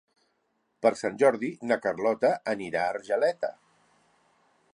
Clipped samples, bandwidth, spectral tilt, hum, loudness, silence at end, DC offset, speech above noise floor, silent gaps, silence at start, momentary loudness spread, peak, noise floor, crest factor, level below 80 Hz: under 0.1%; 11 kHz; -5 dB/octave; none; -27 LUFS; 1.25 s; under 0.1%; 48 dB; none; 0.8 s; 7 LU; -8 dBFS; -74 dBFS; 22 dB; -74 dBFS